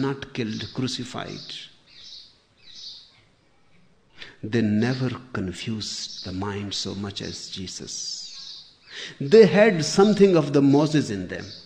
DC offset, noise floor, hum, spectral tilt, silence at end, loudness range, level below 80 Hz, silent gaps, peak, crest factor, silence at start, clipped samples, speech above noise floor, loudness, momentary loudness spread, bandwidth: under 0.1%; -60 dBFS; none; -5.5 dB/octave; 0.05 s; 16 LU; -58 dBFS; none; -4 dBFS; 20 dB; 0 s; under 0.1%; 38 dB; -23 LUFS; 23 LU; 10 kHz